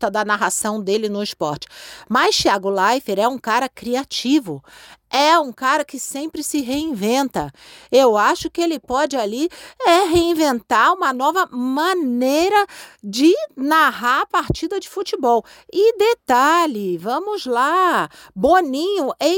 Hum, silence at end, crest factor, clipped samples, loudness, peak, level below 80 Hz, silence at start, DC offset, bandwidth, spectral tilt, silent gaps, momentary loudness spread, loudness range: none; 0 s; 14 dB; under 0.1%; -18 LUFS; -4 dBFS; -48 dBFS; 0 s; under 0.1%; 17 kHz; -3.5 dB/octave; none; 10 LU; 2 LU